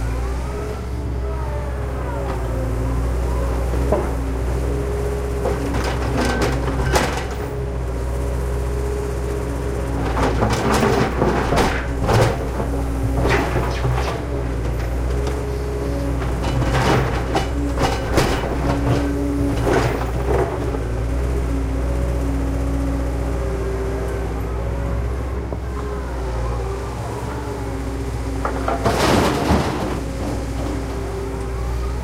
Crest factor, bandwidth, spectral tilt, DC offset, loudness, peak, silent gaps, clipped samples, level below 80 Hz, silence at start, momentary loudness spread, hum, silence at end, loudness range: 18 dB; 16 kHz; -6 dB/octave; under 0.1%; -22 LUFS; -2 dBFS; none; under 0.1%; -24 dBFS; 0 s; 8 LU; none; 0 s; 5 LU